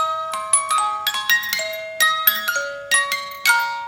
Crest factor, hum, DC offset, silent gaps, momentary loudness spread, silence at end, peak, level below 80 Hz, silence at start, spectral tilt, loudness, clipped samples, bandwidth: 20 dB; none; under 0.1%; none; 7 LU; 0 s; -2 dBFS; -66 dBFS; 0 s; 2.5 dB/octave; -18 LUFS; under 0.1%; 17 kHz